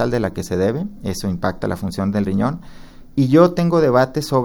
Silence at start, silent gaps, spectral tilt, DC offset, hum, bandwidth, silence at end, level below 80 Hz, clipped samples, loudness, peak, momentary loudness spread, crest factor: 0 s; none; -7 dB/octave; under 0.1%; none; 17.5 kHz; 0 s; -40 dBFS; under 0.1%; -18 LUFS; 0 dBFS; 12 LU; 18 dB